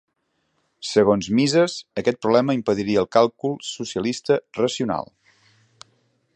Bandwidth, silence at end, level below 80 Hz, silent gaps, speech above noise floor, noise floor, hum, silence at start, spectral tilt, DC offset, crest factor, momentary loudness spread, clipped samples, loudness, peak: 9.4 kHz; 1.35 s; -58 dBFS; none; 51 dB; -71 dBFS; none; 0.8 s; -5 dB/octave; under 0.1%; 20 dB; 10 LU; under 0.1%; -21 LUFS; -2 dBFS